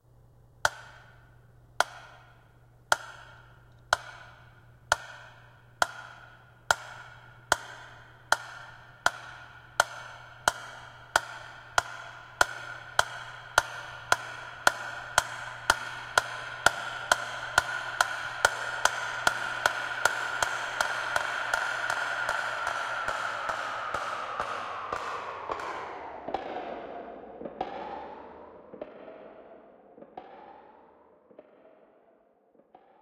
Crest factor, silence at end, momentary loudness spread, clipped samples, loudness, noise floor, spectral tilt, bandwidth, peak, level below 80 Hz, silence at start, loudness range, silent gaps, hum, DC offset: 32 dB; 1.35 s; 20 LU; under 0.1%; -30 LUFS; -64 dBFS; -1 dB/octave; 16.5 kHz; -2 dBFS; -60 dBFS; 0.65 s; 12 LU; none; none; under 0.1%